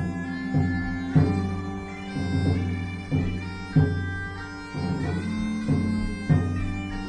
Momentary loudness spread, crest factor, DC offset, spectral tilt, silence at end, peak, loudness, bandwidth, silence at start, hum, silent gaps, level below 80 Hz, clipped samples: 10 LU; 20 dB; under 0.1%; -8 dB/octave; 0 s; -6 dBFS; -27 LUFS; 10 kHz; 0 s; none; none; -40 dBFS; under 0.1%